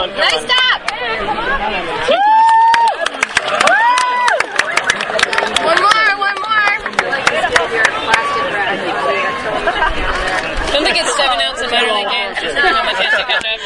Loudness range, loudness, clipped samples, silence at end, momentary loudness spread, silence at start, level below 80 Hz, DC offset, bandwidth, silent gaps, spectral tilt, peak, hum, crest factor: 3 LU; -13 LUFS; under 0.1%; 0 s; 7 LU; 0 s; -34 dBFS; under 0.1%; 11.5 kHz; none; -1.5 dB/octave; 0 dBFS; none; 14 dB